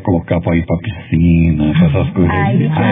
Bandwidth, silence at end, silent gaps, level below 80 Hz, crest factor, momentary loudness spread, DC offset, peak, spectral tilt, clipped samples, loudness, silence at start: 3.8 kHz; 0 s; none; -32 dBFS; 12 dB; 6 LU; under 0.1%; 0 dBFS; -12 dB/octave; under 0.1%; -14 LUFS; 0 s